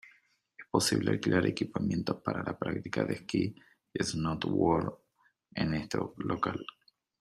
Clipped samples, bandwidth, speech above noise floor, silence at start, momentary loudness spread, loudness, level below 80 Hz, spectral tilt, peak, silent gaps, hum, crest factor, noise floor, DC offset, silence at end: under 0.1%; 15 kHz; 36 dB; 0.05 s; 8 LU; -32 LUFS; -60 dBFS; -5 dB/octave; -12 dBFS; none; none; 22 dB; -67 dBFS; under 0.1%; 0.55 s